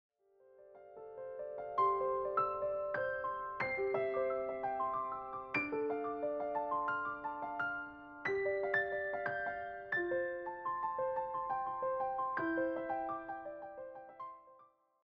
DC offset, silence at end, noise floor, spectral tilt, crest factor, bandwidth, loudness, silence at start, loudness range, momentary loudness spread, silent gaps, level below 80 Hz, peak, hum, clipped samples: under 0.1%; 0.4 s; -66 dBFS; -3.5 dB/octave; 18 dB; 6.4 kHz; -38 LUFS; 0.5 s; 2 LU; 13 LU; none; -72 dBFS; -20 dBFS; none; under 0.1%